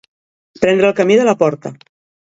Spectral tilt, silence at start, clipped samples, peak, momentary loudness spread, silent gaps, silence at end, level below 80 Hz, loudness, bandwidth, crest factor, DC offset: -5.5 dB/octave; 0.6 s; under 0.1%; 0 dBFS; 14 LU; none; 0.5 s; -56 dBFS; -13 LUFS; 8 kHz; 16 dB; under 0.1%